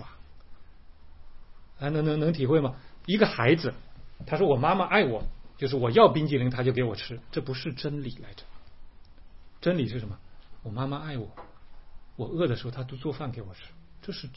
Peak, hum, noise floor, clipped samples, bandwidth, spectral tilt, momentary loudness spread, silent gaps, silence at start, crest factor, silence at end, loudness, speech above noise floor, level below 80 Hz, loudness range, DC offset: -4 dBFS; none; -48 dBFS; under 0.1%; 5.8 kHz; -10.5 dB/octave; 19 LU; none; 0 s; 24 dB; 0.05 s; -27 LUFS; 22 dB; -48 dBFS; 10 LU; 0.3%